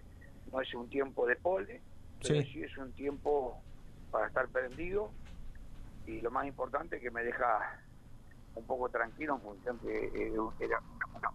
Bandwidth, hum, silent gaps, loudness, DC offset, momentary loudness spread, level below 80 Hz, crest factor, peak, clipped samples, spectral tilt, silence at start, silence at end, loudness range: 13 kHz; none; none; -37 LUFS; under 0.1%; 20 LU; -52 dBFS; 22 dB; -16 dBFS; under 0.1%; -5.5 dB/octave; 0 s; 0 s; 2 LU